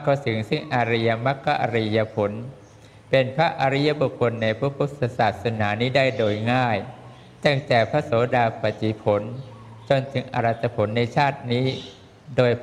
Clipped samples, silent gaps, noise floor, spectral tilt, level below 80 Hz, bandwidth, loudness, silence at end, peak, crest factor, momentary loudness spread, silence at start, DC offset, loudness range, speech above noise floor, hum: under 0.1%; none; -47 dBFS; -7 dB/octave; -58 dBFS; 10.5 kHz; -23 LUFS; 0 s; -4 dBFS; 20 dB; 7 LU; 0 s; under 0.1%; 2 LU; 25 dB; none